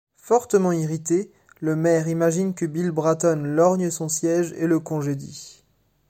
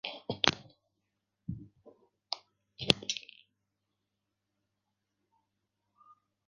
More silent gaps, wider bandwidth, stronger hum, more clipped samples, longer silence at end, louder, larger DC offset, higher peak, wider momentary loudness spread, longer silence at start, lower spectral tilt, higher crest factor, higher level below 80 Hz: neither; first, 16 kHz vs 7.2 kHz; neither; neither; second, 0.6 s vs 3.25 s; first, -22 LUFS vs -33 LUFS; neither; second, -6 dBFS vs -2 dBFS; second, 8 LU vs 19 LU; first, 0.25 s vs 0.05 s; first, -6 dB/octave vs -1.5 dB/octave; second, 16 dB vs 38 dB; about the same, -64 dBFS vs -64 dBFS